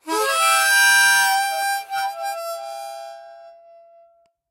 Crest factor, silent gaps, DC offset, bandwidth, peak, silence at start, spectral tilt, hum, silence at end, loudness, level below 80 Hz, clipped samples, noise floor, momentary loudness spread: 18 dB; none; under 0.1%; 16 kHz; -4 dBFS; 0.05 s; 2 dB/octave; none; 1 s; -17 LUFS; -86 dBFS; under 0.1%; -57 dBFS; 20 LU